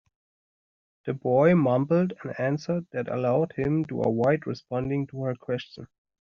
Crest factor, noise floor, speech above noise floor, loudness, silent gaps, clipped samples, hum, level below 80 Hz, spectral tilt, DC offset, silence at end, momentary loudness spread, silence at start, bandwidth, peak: 18 dB; under -90 dBFS; over 65 dB; -26 LUFS; none; under 0.1%; none; -60 dBFS; -7.5 dB/octave; under 0.1%; 0.35 s; 12 LU; 1.05 s; 6.8 kHz; -8 dBFS